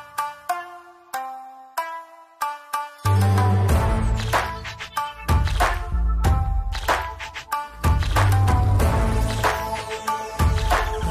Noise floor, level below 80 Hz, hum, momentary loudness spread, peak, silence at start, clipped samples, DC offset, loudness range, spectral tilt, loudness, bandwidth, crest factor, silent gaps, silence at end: -43 dBFS; -26 dBFS; none; 12 LU; -8 dBFS; 0 s; under 0.1%; under 0.1%; 3 LU; -5.5 dB/octave; -23 LUFS; 15.5 kHz; 14 dB; none; 0 s